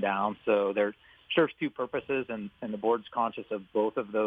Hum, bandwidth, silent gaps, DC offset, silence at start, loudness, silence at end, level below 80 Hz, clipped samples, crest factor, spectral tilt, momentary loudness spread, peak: none; 4.6 kHz; none; under 0.1%; 0 s; -30 LUFS; 0 s; -70 dBFS; under 0.1%; 20 dB; -8 dB/octave; 8 LU; -10 dBFS